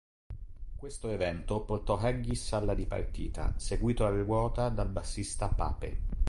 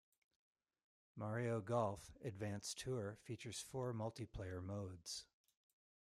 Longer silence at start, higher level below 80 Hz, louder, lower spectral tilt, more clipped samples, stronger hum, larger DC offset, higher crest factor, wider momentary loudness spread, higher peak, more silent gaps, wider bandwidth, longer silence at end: second, 0.3 s vs 1.15 s; first, -36 dBFS vs -70 dBFS; first, -34 LUFS vs -47 LUFS; about the same, -6 dB/octave vs -5 dB/octave; neither; neither; neither; about the same, 16 dB vs 20 dB; first, 15 LU vs 10 LU; first, -16 dBFS vs -28 dBFS; neither; second, 11.5 kHz vs 15.5 kHz; second, 0 s vs 0.85 s